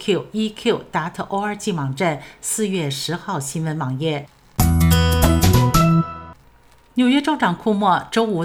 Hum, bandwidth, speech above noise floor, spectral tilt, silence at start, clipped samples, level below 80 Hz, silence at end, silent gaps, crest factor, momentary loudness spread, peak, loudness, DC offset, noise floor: none; 17 kHz; 30 dB; -5.5 dB/octave; 0 s; under 0.1%; -30 dBFS; 0 s; none; 18 dB; 10 LU; -2 dBFS; -19 LUFS; under 0.1%; -51 dBFS